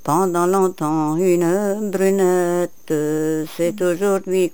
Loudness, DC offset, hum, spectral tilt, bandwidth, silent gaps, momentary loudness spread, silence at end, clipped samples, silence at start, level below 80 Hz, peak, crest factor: -19 LUFS; 1%; none; -6 dB/octave; over 20 kHz; none; 6 LU; 0.05 s; under 0.1%; 0.05 s; -62 dBFS; -4 dBFS; 14 dB